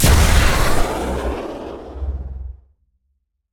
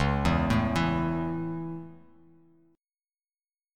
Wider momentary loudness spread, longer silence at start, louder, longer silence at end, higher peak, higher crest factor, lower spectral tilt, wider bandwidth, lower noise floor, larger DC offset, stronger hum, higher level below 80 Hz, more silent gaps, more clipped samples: first, 18 LU vs 14 LU; about the same, 0 s vs 0 s; first, -19 LUFS vs -28 LUFS; second, 1 s vs 1.8 s; first, -2 dBFS vs -12 dBFS; about the same, 16 dB vs 20 dB; second, -4.5 dB/octave vs -7 dB/octave; first, 19 kHz vs 13 kHz; second, -69 dBFS vs under -90 dBFS; neither; neither; first, -20 dBFS vs -40 dBFS; neither; neither